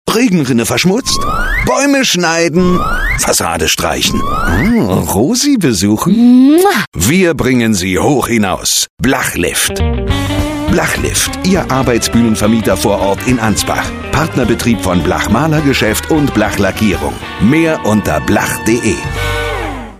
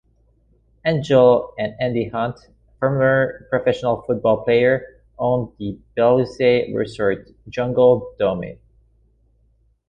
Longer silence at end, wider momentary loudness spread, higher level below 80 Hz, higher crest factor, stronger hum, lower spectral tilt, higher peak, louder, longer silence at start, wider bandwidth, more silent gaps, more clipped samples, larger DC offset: second, 0 s vs 1.35 s; second, 5 LU vs 12 LU; first, -26 dBFS vs -50 dBFS; second, 12 dB vs 18 dB; neither; second, -4.5 dB/octave vs -7.5 dB/octave; about the same, 0 dBFS vs -2 dBFS; first, -12 LUFS vs -19 LUFS; second, 0.05 s vs 0.85 s; first, 15.5 kHz vs 8.4 kHz; first, 6.87-6.92 s, 8.90-8.97 s vs none; neither; neither